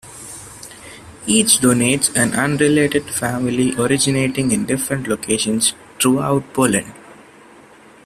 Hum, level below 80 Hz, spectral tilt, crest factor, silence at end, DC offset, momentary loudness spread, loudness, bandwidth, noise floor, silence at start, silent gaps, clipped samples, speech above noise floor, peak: none; -50 dBFS; -3.5 dB/octave; 18 dB; 0.9 s; under 0.1%; 20 LU; -16 LUFS; 15 kHz; -45 dBFS; 0.05 s; none; under 0.1%; 28 dB; 0 dBFS